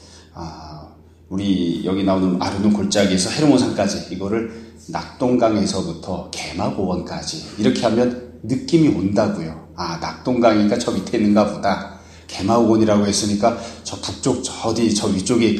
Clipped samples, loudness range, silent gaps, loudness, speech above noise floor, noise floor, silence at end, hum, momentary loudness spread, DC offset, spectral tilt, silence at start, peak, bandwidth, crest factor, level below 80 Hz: under 0.1%; 4 LU; none; -19 LUFS; 25 dB; -43 dBFS; 0 s; none; 14 LU; under 0.1%; -5 dB/octave; 0.05 s; 0 dBFS; 12.5 kHz; 18 dB; -48 dBFS